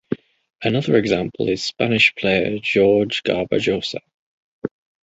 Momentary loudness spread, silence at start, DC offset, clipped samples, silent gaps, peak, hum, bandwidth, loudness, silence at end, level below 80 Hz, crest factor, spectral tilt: 17 LU; 0.1 s; under 0.1%; under 0.1%; 0.55-0.59 s, 4.14-4.62 s; -2 dBFS; none; 8 kHz; -19 LUFS; 0.35 s; -52 dBFS; 18 dB; -5.5 dB/octave